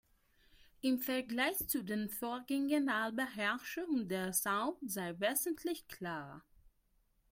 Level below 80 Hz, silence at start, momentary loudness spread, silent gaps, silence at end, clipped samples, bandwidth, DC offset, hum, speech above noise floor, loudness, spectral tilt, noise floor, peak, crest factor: -70 dBFS; 0.85 s; 8 LU; none; 0.65 s; under 0.1%; 16.5 kHz; under 0.1%; none; 38 dB; -37 LUFS; -3.5 dB/octave; -75 dBFS; -20 dBFS; 18 dB